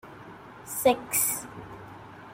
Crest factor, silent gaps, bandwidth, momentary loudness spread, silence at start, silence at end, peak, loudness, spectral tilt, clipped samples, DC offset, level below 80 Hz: 22 dB; none; 16 kHz; 21 LU; 0.05 s; 0 s; -10 dBFS; -26 LUFS; -2.5 dB/octave; under 0.1%; under 0.1%; -62 dBFS